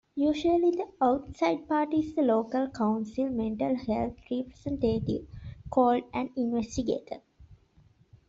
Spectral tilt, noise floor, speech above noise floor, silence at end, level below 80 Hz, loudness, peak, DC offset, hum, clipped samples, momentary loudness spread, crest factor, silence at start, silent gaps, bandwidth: -7 dB/octave; -62 dBFS; 34 dB; 0.75 s; -54 dBFS; -29 LUFS; -12 dBFS; under 0.1%; none; under 0.1%; 10 LU; 18 dB; 0.15 s; none; 7.8 kHz